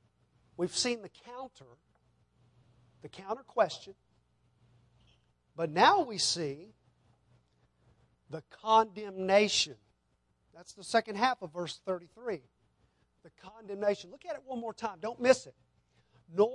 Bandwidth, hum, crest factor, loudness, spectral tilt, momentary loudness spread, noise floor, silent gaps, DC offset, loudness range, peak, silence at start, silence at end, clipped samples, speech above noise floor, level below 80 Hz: 11.5 kHz; none; 24 dB; -31 LUFS; -3 dB/octave; 21 LU; -75 dBFS; none; under 0.1%; 8 LU; -10 dBFS; 0.6 s; 0 s; under 0.1%; 43 dB; -74 dBFS